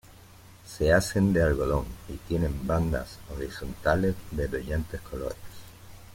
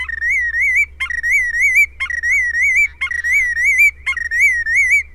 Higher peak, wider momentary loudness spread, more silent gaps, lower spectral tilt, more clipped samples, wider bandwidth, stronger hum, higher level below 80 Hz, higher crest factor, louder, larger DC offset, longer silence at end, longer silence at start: second, -8 dBFS vs -4 dBFS; first, 18 LU vs 6 LU; neither; first, -6.5 dB/octave vs 0.5 dB/octave; neither; about the same, 16.5 kHz vs 16.5 kHz; neither; about the same, -40 dBFS vs -40 dBFS; first, 20 dB vs 12 dB; second, -28 LUFS vs -13 LUFS; neither; about the same, 0 s vs 0 s; about the same, 0.05 s vs 0 s